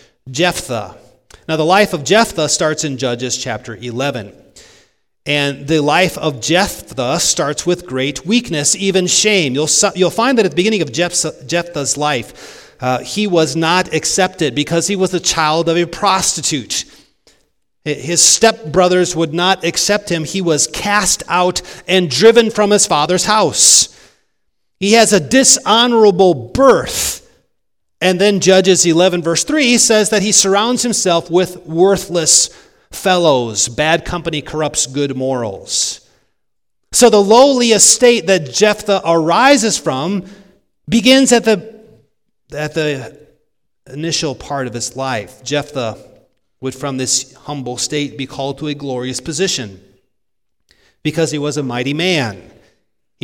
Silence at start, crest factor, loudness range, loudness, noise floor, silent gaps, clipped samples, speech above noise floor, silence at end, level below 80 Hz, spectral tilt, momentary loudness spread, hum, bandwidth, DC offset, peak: 0.25 s; 14 dB; 10 LU; -13 LUFS; -77 dBFS; none; 0.2%; 63 dB; 0.85 s; -46 dBFS; -3 dB/octave; 13 LU; none; over 20 kHz; under 0.1%; 0 dBFS